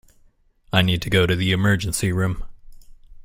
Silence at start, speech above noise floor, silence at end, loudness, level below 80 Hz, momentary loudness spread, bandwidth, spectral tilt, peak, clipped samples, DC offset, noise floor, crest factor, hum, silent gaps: 0.75 s; 37 dB; 0.05 s; -20 LUFS; -40 dBFS; 5 LU; 16.5 kHz; -5 dB/octave; -4 dBFS; under 0.1%; under 0.1%; -57 dBFS; 18 dB; none; none